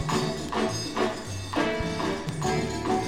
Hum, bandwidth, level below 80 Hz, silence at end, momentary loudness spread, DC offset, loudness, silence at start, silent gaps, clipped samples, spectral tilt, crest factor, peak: none; 16 kHz; -46 dBFS; 0 s; 2 LU; 0.4%; -28 LUFS; 0 s; none; under 0.1%; -4.5 dB/octave; 18 dB; -12 dBFS